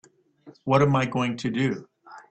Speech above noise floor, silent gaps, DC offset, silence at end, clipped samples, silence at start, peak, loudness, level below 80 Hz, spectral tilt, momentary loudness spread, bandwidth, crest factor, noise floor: 29 dB; none; under 0.1%; 0.1 s; under 0.1%; 0.45 s; -8 dBFS; -24 LUFS; -60 dBFS; -7 dB/octave; 13 LU; 8.6 kHz; 18 dB; -53 dBFS